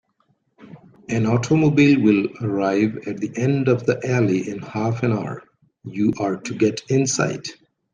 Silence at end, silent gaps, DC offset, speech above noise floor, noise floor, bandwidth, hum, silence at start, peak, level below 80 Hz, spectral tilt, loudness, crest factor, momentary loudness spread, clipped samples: 0.4 s; none; under 0.1%; 46 dB; -66 dBFS; 10 kHz; none; 0.6 s; -4 dBFS; -60 dBFS; -6 dB/octave; -20 LUFS; 16 dB; 14 LU; under 0.1%